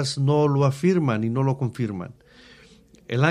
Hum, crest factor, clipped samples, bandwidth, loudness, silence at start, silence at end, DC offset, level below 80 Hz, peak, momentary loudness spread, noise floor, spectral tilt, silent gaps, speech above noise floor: none; 18 dB; under 0.1%; 11.5 kHz; -23 LUFS; 0 s; 0 s; under 0.1%; -60 dBFS; -6 dBFS; 10 LU; -52 dBFS; -7 dB/octave; none; 30 dB